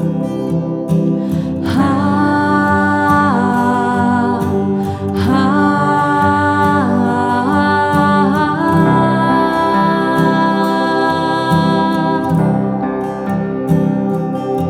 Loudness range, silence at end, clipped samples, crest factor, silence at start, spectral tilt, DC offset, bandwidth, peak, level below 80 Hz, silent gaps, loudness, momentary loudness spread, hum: 2 LU; 0 s; under 0.1%; 12 dB; 0 s; -7.5 dB/octave; under 0.1%; 14.5 kHz; -2 dBFS; -44 dBFS; none; -14 LUFS; 6 LU; none